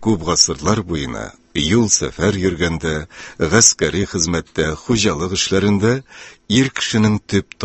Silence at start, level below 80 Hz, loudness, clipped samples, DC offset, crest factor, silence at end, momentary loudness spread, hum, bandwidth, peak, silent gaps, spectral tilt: 0 s; -36 dBFS; -17 LUFS; under 0.1%; under 0.1%; 18 dB; 0 s; 11 LU; none; 14 kHz; 0 dBFS; none; -3.5 dB/octave